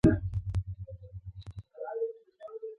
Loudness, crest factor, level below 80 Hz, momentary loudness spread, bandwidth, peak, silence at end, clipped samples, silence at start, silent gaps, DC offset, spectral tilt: -36 LUFS; 22 dB; -44 dBFS; 13 LU; 11 kHz; -10 dBFS; 0.05 s; under 0.1%; 0.05 s; none; under 0.1%; -9.5 dB/octave